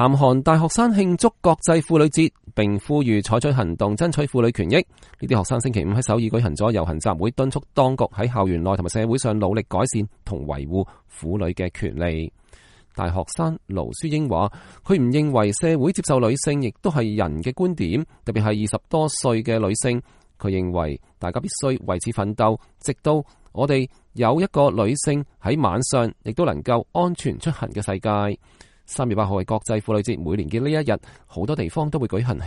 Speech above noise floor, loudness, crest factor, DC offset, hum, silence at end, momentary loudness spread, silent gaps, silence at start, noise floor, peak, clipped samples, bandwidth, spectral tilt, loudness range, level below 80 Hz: 30 dB; -22 LUFS; 18 dB; under 0.1%; none; 0 s; 9 LU; none; 0 s; -51 dBFS; -2 dBFS; under 0.1%; 11.5 kHz; -6 dB/octave; 5 LU; -42 dBFS